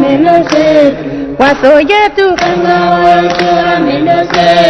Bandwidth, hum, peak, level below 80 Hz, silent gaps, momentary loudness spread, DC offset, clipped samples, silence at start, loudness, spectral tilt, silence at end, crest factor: 9.6 kHz; none; 0 dBFS; -38 dBFS; none; 4 LU; under 0.1%; 3%; 0 s; -8 LUFS; -5.5 dB/octave; 0 s; 8 dB